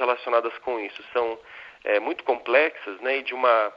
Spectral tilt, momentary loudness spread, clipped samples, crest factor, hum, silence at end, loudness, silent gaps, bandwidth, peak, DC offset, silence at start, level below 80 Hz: -4 dB/octave; 10 LU; under 0.1%; 20 dB; none; 0 s; -25 LUFS; none; 5.8 kHz; -4 dBFS; under 0.1%; 0 s; -70 dBFS